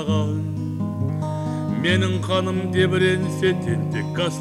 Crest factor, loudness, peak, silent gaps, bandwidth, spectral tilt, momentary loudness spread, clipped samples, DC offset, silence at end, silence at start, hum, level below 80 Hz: 16 dB; -22 LUFS; -6 dBFS; none; 12.5 kHz; -6.5 dB/octave; 6 LU; under 0.1%; under 0.1%; 0 s; 0 s; none; -54 dBFS